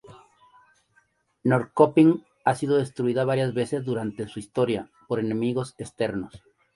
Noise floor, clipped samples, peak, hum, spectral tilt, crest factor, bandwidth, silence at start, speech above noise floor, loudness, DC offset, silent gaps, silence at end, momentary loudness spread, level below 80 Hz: -66 dBFS; under 0.1%; -4 dBFS; none; -7 dB/octave; 22 dB; 11.5 kHz; 0.05 s; 42 dB; -25 LUFS; under 0.1%; none; 0.4 s; 12 LU; -62 dBFS